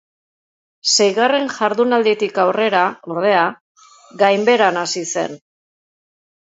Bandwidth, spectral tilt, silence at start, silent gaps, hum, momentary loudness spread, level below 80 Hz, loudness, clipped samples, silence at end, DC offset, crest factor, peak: 8 kHz; -2.5 dB/octave; 0.85 s; 3.61-3.75 s; none; 8 LU; -72 dBFS; -16 LUFS; under 0.1%; 1.15 s; under 0.1%; 18 dB; 0 dBFS